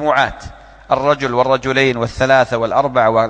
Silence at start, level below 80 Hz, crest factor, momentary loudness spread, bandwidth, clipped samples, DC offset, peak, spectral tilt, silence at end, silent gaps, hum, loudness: 0 s; -40 dBFS; 14 dB; 5 LU; 9.2 kHz; under 0.1%; under 0.1%; 0 dBFS; -5.5 dB/octave; 0 s; none; none; -15 LUFS